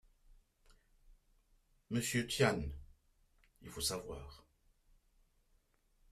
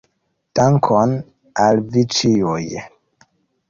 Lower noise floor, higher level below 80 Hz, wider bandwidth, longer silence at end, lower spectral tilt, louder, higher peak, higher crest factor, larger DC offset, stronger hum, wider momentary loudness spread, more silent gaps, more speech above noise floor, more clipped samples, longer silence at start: first, -74 dBFS vs -69 dBFS; second, -58 dBFS vs -52 dBFS; first, 14.5 kHz vs 7.6 kHz; first, 1.7 s vs 0.85 s; second, -4 dB/octave vs -5.5 dB/octave; second, -37 LUFS vs -17 LUFS; second, -18 dBFS vs -2 dBFS; first, 26 dB vs 16 dB; neither; neither; first, 19 LU vs 12 LU; neither; second, 37 dB vs 53 dB; neither; second, 0.3 s vs 0.55 s